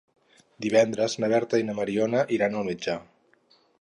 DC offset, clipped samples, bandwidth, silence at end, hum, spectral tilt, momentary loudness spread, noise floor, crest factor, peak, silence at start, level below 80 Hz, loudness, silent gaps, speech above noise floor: under 0.1%; under 0.1%; 11 kHz; 0.8 s; none; -5 dB/octave; 9 LU; -63 dBFS; 20 dB; -6 dBFS; 0.6 s; -66 dBFS; -26 LUFS; none; 38 dB